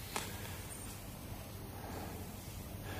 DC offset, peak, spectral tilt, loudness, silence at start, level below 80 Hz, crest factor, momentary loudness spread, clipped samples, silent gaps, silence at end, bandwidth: under 0.1%; -20 dBFS; -4 dB/octave; -46 LUFS; 0 s; -54 dBFS; 26 dB; 5 LU; under 0.1%; none; 0 s; 15.5 kHz